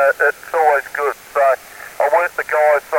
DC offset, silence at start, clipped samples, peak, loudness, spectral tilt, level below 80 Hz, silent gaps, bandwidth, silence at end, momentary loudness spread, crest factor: under 0.1%; 0 s; under 0.1%; -4 dBFS; -17 LUFS; -2 dB/octave; -60 dBFS; none; 17 kHz; 0 s; 7 LU; 14 dB